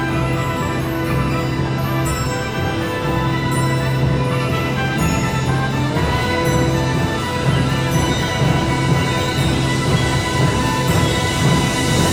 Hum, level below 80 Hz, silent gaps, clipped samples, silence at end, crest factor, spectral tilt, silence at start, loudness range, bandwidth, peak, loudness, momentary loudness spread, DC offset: none; -30 dBFS; none; under 0.1%; 0 s; 14 dB; -5.5 dB/octave; 0 s; 3 LU; 17.5 kHz; -2 dBFS; -18 LUFS; 4 LU; under 0.1%